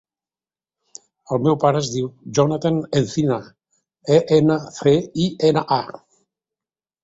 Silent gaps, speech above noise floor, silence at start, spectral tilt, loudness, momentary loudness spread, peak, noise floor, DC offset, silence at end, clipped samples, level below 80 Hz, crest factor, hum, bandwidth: none; over 72 dB; 1.3 s; -6.5 dB/octave; -19 LUFS; 9 LU; -2 dBFS; under -90 dBFS; under 0.1%; 1.05 s; under 0.1%; -56 dBFS; 18 dB; none; 8 kHz